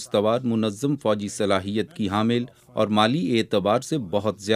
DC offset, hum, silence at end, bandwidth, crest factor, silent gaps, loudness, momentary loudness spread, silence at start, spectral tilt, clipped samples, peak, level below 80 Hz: under 0.1%; none; 0 s; 15 kHz; 20 dB; none; -23 LUFS; 6 LU; 0 s; -5.5 dB/octave; under 0.1%; -4 dBFS; -64 dBFS